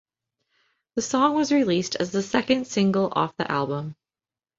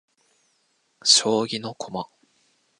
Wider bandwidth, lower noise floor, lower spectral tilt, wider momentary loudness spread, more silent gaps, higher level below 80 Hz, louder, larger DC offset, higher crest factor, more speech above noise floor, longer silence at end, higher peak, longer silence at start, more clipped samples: second, 8 kHz vs 11 kHz; first, under -90 dBFS vs -68 dBFS; first, -5 dB/octave vs -1.5 dB/octave; second, 9 LU vs 17 LU; neither; first, -62 dBFS vs -72 dBFS; second, -24 LUFS vs -21 LUFS; neither; about the same, 20 dB vs 24 dB; first, over 67 dB vs 46 dB; about the same, 0.65 s vs 0.75 s; second, -6 dBFS vs -2 dBFS; about the same, 0.95 s vs 1.05 s; neither